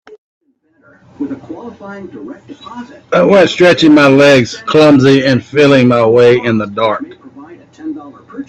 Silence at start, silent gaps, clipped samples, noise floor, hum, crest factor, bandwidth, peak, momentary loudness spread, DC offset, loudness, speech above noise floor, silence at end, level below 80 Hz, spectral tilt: 1.2 s; none; under 0.1%; -50 dBFS; none; 12 dB; 9.8 kHz; 0 dBFS; 23 LU; under 0.1%; -8 LUFS; 41 dB; 0.05 s; -50 dBFS; -6 dB/octave